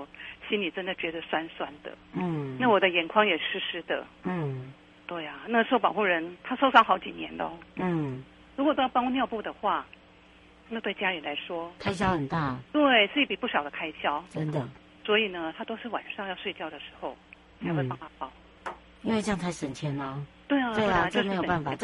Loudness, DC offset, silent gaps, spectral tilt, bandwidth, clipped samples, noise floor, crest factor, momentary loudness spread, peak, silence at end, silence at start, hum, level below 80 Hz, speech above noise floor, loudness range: -28 LUFS; under 0.1%; none; -5.5 dB/octave; 11.5 kHz; under 0.1%; -55 dBFS; 26 dB; 16 LU; -2 dBFS; 0 s; 0 s; none; -58 dBFS; 27 dB; 7 LU